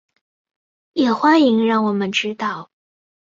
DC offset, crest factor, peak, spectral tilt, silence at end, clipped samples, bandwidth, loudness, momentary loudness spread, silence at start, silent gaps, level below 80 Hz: under 0.1%; 16 dB; -2 dBFS; -5 dB/octave; 0.7 s; under 0.1%; 7.6 kHz; -17 LUFS; 12 LU; 0.95 s; none; -66 dBFS